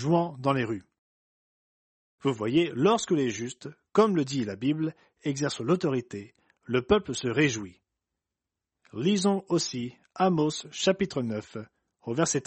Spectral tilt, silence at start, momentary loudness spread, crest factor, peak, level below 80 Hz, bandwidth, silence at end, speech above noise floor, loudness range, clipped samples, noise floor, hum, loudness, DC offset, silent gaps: -5 dB/octave; 0 s; 13 LU; 20 dB; -8 dBFS; -60 dBFS; 8.4 kHz; 0.05 s; 61 dB; 2 LU; under 0.1%; -88 dBFS; none; -28 LUFS; under 0.1%; 0.98-2.18 s